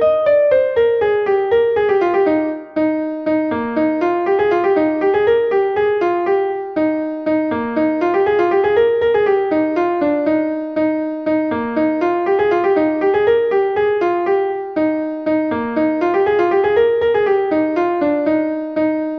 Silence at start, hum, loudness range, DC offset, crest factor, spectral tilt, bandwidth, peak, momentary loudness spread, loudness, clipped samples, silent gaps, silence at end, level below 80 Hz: 0 s; none; 1 LU; under 0.1%; 12 dB; -7.5 dB/octave; 6.2 kHz; -4 dBFS; 5 LU; -16 LUFS; under 0.1%; none; 0 s; -52 dBFS